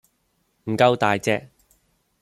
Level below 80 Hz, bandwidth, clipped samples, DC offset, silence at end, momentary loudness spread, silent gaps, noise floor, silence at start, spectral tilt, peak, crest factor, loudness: -62 dBFS; 14.5 kHz; under 0.1%; under 0.1%; 0.75 s; 12 LU; none; -69 dBFS; 0.65 s; -5.5 dB/octave; -4 dBFS; 22 dB; -21 LUFS